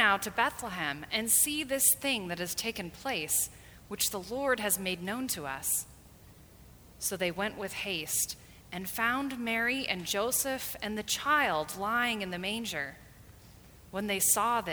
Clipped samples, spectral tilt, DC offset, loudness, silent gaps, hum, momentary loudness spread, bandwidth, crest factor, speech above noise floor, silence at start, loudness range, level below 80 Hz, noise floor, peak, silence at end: under 0.1%; -1.5 dB/octave; under 0.1%; -30 LUFS; none; none; 11 LU; over 20 kHz; 22 dB; 23 dB; 0 s; 5 LU; -60 dBFS; -55 dBFS; -10 dBFS; 0 s